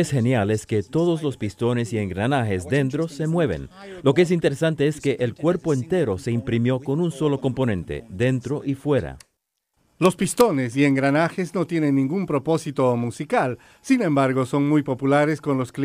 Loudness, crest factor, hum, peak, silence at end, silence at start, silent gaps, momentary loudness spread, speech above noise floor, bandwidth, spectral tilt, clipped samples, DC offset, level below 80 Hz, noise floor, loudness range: -22 LUFS; 18 dB; none; -4 dBFS; 0 s; 0 s; none; 6 LU; 53 dB; 15.5 kHz; -6.5 dB/octave; under 0.1%; under 0.1%; -52 dBFS; -75 dBFS; 3 LU